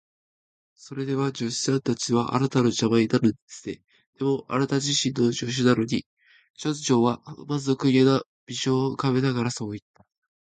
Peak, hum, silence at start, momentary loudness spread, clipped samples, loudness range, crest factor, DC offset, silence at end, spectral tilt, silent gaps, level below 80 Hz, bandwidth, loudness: -6 dBFS; none; 0.85 s; 13 LU; under 0.1%; 1 LU; 20 dB; under 0.1%; 0.65 s; -5 dB/octave; 3.42-3.48 s, 4.07-4.13 s, 6.06-6.17 s, 6.50-6.54 s, 8.26-8.47 s; -62 dBFS; 9.4 kHz; -24 LUFS